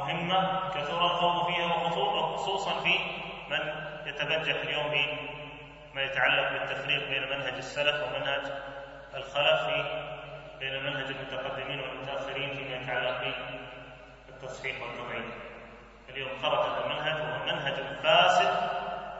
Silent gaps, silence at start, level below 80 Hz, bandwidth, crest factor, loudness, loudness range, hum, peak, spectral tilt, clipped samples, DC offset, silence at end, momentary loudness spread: none; 0 s; -58 dBFS; 7.6 kHz; 22 dB; -29 LUFS; 7 LU; none; -8 dBFS; -1 dB/octave; under 0.1%; under 0.1%; 0 s; 16 LU